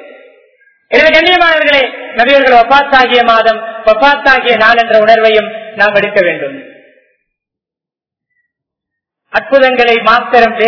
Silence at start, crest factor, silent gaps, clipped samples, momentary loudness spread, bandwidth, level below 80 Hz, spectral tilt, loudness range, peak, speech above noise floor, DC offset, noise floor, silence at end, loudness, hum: 0 s; 10 dB; none; 3%; 7 LU; 5.4 kHz; -44 dBFS; -4 dB/octave; 10 LU; 0 dBFS; 79 dB; under 0.1%; -86 dBFS; 0 s; -7 LUFS; none